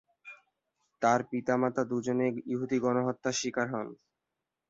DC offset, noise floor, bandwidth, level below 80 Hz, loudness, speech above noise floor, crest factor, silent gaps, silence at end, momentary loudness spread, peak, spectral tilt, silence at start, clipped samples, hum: under 0.1%; -87 dBFS; 8 kHz; -72 dBFS; -31 LUFS; 57 dB; 18 dB; none; 0.75 s; 13 LU; -14 dBFS; -5 dB/octave; 0.25 s; under 0.1%; none